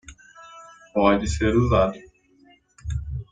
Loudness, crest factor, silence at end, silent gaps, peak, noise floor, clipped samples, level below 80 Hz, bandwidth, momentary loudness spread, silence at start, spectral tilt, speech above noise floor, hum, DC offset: -22 LUFS; 20 dB; 0.1 s; none; -4 dBFS; -57 dBFS; under 0.1%; -36 dBFS; 9.4 kHz; 24 LU; 0.1 s; -6.5 dB/octave; 37 dB; none; under 0.1%